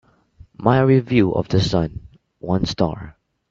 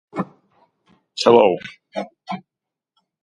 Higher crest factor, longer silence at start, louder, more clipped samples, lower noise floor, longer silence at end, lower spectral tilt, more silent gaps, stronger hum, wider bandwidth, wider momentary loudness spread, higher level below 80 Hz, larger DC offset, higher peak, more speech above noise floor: about the same, 20 dB vs 22 dB; first, 0.6 s vs 0.15 s; about the same, -19 LUFS vs -18 LUFS; neither; second, -49 dBFS vs -82 dBFS; second, 0.4 s vs 0.85 s; first, -7 dB/octave vs -5 dB/octave; neither; neither; second, 7.6 kHz vs 11.5 kHz; about the same, 20 LU vs 19 LU; first, -42 dBFS vs -64 dBFS; neither; about the same, 0 dBFS vs 0 dBFS; second, 31 dB vs 65 dB